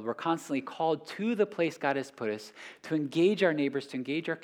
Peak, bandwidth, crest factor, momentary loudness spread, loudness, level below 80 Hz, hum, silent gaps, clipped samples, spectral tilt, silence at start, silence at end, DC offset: -14 dBFS; 15 kHz; 18 dB; 9 LU; -31 LUFS; -88 dBFS; none; none; under 0.1%; -6 dB/octave; 0 s; 0 s; under 0.1%